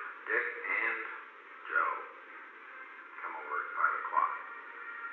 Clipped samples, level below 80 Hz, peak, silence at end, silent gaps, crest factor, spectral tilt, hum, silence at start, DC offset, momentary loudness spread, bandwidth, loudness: under 0.1%; under -90 dBFS; -16 dBFS; 0 s; none; 20 dB; 3.5 dB/octave; none; 0 s; under 0.1%; 16 LU; 4.4 kHz; -34 LUFS